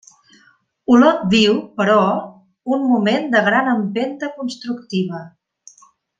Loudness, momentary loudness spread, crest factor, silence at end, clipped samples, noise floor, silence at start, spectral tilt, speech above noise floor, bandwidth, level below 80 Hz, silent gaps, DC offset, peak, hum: -17 LUFS; 14 LU; 16 dB; 0.9 s; under 0.1%; -56 dBFS; 0.9 s; -5.5 dB/octave; 39 dB; 7.8 kHz; -60 dBFS; none; under 0.1%; -2 dBFS; none